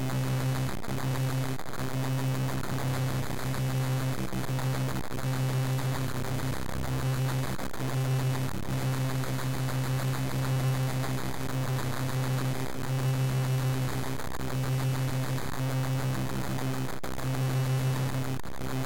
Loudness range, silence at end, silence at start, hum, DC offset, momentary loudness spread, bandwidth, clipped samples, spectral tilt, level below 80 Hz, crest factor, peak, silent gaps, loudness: 1 LU; 0 s; 0 s; none; 2%; 5 LU; 17 kHz; under 0.1%; -6 dB/octave; -48 dBFS; 10 dB; -20 dBFS; none; -31 LUFS